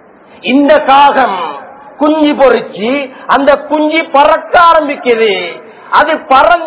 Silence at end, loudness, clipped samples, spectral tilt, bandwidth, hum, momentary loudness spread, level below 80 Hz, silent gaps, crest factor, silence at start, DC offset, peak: 0 s; -9 LUFS; 4%; -7.5 dB/octave; 4 kHz; none; 10 LU; -44 dBFS; none; 10 dB; 0.45 s; under 0.1%; 0 dBFS